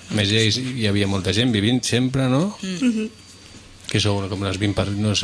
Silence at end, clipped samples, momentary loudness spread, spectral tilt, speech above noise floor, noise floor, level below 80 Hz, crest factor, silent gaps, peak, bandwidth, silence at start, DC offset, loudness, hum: 0 s; under 0.1%; 7 LU; -5 dB/octave; 23 dB; -43 dBFS; -48 dBFS; 16 dB; none; -6 dBFS; 11 kHz; 0 s; under 0.1%; -21 LUFS; none